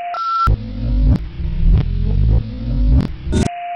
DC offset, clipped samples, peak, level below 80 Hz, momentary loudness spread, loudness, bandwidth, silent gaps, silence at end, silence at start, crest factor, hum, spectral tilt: under 0.1%; under 0.1%; -6 dBFS; -18 dBFS; 5 LU; -18 LUFS; 9.8 kHz; none; 0 s; 0 s; 10 dB; none; -7.5 dB/octave